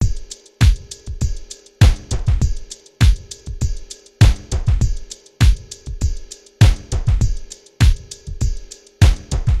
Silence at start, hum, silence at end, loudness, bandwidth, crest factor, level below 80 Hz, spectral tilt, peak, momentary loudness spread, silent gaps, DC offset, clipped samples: 0 s; none; 0 s; -19 LUFS; 13 kHz; 16 dB; -20 dBFS; -5.5 dB/octave; -2 dBFS; 18 LU; none; under 0.1%; under 0.1%